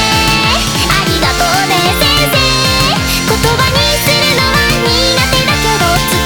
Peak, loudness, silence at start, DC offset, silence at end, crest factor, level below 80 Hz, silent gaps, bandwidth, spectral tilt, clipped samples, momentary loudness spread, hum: 0 dBFS; -9 LUFS; 0 s; under 0.1%; 0 s; 10 dB; -22 dBFS; none; over 20 kHz; -3 dB/octave; under 0.1%; 2 LU; none